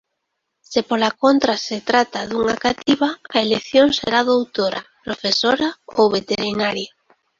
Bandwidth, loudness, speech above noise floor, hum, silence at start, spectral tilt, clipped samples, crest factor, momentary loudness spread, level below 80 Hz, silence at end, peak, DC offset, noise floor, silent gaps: 7.6 kHz; -19 LUFS; 58 dB; none; 0.7 s; -4 dB/octave; under 0.1%; 18 dB; 8 LU; -54 dBFS; 0.5 s; -2 dBFS; under 0.1%; -76 dBFS; none